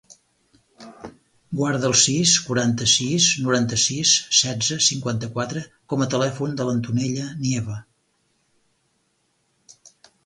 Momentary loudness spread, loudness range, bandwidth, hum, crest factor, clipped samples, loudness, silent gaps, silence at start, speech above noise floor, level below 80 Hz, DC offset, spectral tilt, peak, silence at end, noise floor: 13 LU; 11 LU; 11.5 kHz; none; 20 dB; under 0.1%; -20 LUFS; none; 0.8 s; 47 dB; -58 dBFS; under 0.1%; -3 dB/octave; -2 dBFS; 2.45 s; -68 dBFS